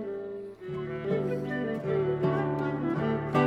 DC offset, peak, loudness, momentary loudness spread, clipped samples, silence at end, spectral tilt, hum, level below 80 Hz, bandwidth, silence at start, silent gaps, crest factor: under 0.1%; -12 dBFS; -31 LUFS; 10 LU; under 0.1%; 0 s; -9 dB/octave; none; -58 dBFS; 8 kHz; 0 s; none; 18 dB